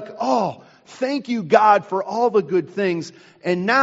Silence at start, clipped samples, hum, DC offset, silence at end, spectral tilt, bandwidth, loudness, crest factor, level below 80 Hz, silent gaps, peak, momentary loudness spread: 0 s; under 0.1%; none; under 0.1%; 0 s; -4 dB/octave; 8 kHz; -20 LUFS; 20 dB; -70 dBFS; none; 0 dBFS; 12 LU